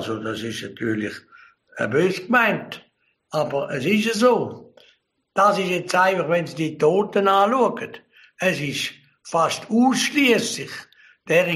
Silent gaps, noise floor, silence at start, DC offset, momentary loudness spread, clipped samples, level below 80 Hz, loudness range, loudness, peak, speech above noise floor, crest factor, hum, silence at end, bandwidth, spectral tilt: none; -51 dBFS; 0 s; under 0.1%; 13 LU; under 0.1%; -66 dBFS; 4 LU; -21 LUFS; -4 dBFS; 30 dB; 18 dB; none; 0 s; 15 kHz; -4.5 dB/octave